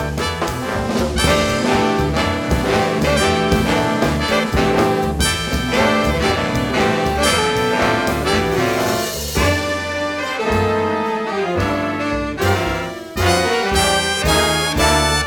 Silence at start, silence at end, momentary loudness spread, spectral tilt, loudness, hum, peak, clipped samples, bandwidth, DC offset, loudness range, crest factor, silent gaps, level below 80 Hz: 0 s; 0 s; 5 LU; -4 dB/octave; -17 LUFS; none; 0 dBFS; under 0.1%; 19 kHz; under 0.1%; 3 LU; 16 dB; none; -30 dBFS